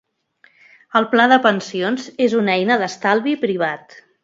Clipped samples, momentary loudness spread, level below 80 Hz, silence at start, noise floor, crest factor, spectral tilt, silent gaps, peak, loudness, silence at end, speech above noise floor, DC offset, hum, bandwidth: under 0.1%; 9 LU; -70 dBFS; 0.95 s; -56 dBFS; 18 dB; -5 dB/octave; none; 0 dBFS; -17 LUFS; 0.45 s; 39 dB; under 0.1%; none; 7.8 kHz